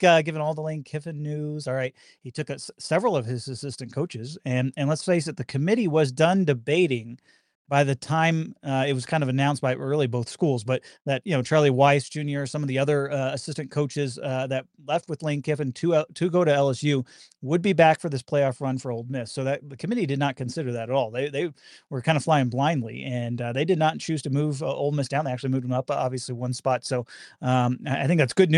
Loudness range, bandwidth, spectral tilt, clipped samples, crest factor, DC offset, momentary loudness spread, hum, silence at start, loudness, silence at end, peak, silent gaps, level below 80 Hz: 4 LU; 11 kHz; -6 dB/octave; under 0.1%; 20 dB; under 0.1%; 10 LU; none; 0 s; -25 LUFS; 0 s; -6 dBFS; 7.55-7.65 s; -68 dBFS